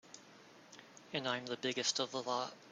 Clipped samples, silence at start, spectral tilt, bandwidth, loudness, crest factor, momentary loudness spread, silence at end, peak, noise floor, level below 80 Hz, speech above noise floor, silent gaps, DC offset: under 0.1%; 0.05 s; -2 dB/octave; 13 kHz; -38 LUFS; 22 dB; 22 LU; 0 s; -20 dBFS; -60 dBFS; -86 dBFS; 21 dB; none; under 0.1%